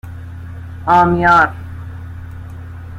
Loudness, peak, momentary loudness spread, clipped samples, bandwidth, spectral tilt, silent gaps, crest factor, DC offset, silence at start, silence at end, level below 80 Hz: -12 LUFS; -2 dBFS; 21 LU; under 0.1%; 15.5 kHz; -7 dB/octave; none; 16 dB; under 0.1%; 0.05 s; 0 s; -40 dBFS